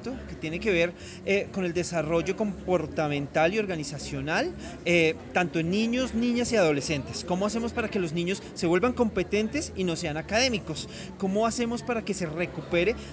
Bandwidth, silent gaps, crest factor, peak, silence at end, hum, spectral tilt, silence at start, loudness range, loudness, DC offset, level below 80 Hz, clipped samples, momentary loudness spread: 8 kHz; none; 18 dB; -8 dBFS; 0 s; none; -5 dB/octave; 0 s; 2 LU; -27 LUFS; under 0.1%; -48 dBFS; under 0.1%; 8 LU